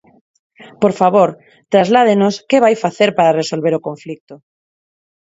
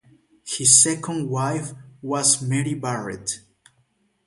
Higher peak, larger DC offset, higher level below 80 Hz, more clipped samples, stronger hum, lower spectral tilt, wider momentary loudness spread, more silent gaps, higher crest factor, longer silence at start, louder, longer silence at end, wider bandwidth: about the same, 0 dBFS vs 0 dBFS; neither; about the same, -62 dBFS vs -62 dBFS; neither; neither; first, -5.5 dB/octave vs -3 dB/octave; second, 13 LU vs 17 LU; first, 4.20-4.27 s vs none; second, 16 dB vs 22 dB; first, 0.6 s vs 0.45 s; first, -14 LUFS vs -20 LUFS; about the same, 0.95 s vs 0.9 s; second, 8 kHz vs 12 kHz